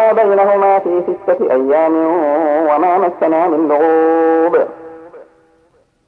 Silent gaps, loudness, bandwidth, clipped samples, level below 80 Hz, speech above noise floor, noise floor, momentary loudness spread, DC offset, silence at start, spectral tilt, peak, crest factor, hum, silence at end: none; -13 LUFS; 4.3 kHz; under 0.1%; -64 dBFS; 43 dB; -55 dBFS; 5 LU; under 0.1%; 0 s; -8.5 dB/octave; -2 dBFS; 12 dB; none; 0.85 s